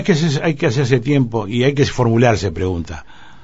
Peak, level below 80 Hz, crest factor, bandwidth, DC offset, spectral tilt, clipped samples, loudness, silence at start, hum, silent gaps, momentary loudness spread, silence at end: 0 dBFS; -38 dBFS; 16 dB; 8 kHz; 1%; -6.5 dB/octave; under 0.1%; -16 LUFS; 0 s; none; none; 8 LU; 0.4 s